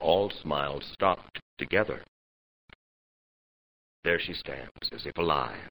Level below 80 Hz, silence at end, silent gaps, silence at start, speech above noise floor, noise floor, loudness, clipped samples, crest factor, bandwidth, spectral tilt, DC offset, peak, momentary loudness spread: -56 dBFS; 0 s; 1.42-1.57 s, 2.08-2.68 s, 2.75-4.03 s, 4.71-4.75 s; 0 s; over 59 dB; under -90 dBFS; -30 LUFS; under 0.1%; 24 dB; over 20 kHz; -7.5 dB/octave; 0.2%; -8 dBFS; 10 LU